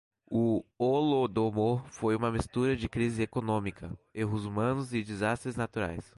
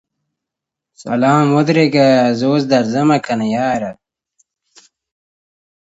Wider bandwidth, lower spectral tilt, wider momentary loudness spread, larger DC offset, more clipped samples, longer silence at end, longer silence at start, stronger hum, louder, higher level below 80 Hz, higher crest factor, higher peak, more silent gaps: first, 11.5 kHz vs 8 kHz; about the same, -7 dB/octave vs -6.5 dB/octave; second, 7 LU vs 10 LU; neither; neither; second, 0.15 s vs 2.05 s; second, 0.3 s vs 1 s; neither; second, -31 LUFS vs -14 LUFS; first, -52 dBFS vs -60 dBFS; about the same, 16 dB vs 16 dB; second, -16 dBFS vs 0 dBFS; neither